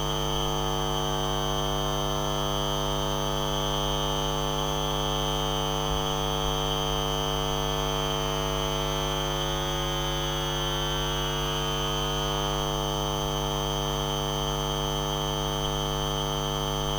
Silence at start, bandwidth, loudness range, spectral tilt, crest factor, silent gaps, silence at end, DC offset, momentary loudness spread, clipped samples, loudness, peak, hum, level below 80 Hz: 0 s; over 20 kHz; 1 LU; -4 dB/octave; 14 dB; none; 0 s; under 0.1%; 1 LU; under 0.1%; -27 LUFS; -14 dBFS; 50 Hz at -35 dBFS; -36 dBFS